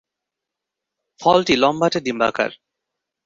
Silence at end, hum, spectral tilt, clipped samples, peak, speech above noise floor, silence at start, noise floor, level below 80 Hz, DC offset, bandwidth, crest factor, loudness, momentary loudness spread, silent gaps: 0.7 s; none; -4.5 dB/octave; under 0.1%; -2 dBFS; 66 dB; 1.2 s; -84 dBFS; -58 dBFS; under 0.1%; 7.8 kHz; 20 dB; -18 LUFS; 8 LU; none